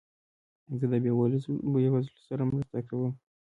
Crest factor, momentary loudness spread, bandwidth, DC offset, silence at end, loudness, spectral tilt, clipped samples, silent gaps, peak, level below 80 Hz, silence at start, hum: 14 dB; 9 LU; 4.5 kHz; under 0.1%; 0.35 s; -30 LUFS; -11 dB/octave; under 0.1%; none; -16 dBFS; -62 dBFS; 0.7 s; none